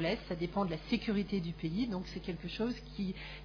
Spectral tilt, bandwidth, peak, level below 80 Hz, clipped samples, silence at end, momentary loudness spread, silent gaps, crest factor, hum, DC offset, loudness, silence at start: -5 dB/octave; 5.4 kHz; -18 dBFS; -52 dBFS; under 0.1%; 0 s; 6 LU; none; 18 dB; none; under 0.1%; -37 LUFS; 0 s